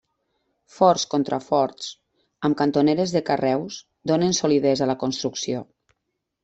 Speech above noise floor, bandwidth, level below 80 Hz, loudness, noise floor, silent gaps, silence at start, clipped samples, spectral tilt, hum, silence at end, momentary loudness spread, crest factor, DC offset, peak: 57 dB; 8.2 kHz; -62 dBFS; -22 LUFS; -79 dBFS; none; 0.8 s; under 0.1%; -5 dB/octave; none; 0.8 s; 10 LU; 20 dB; under 0.1%; -4 dBFS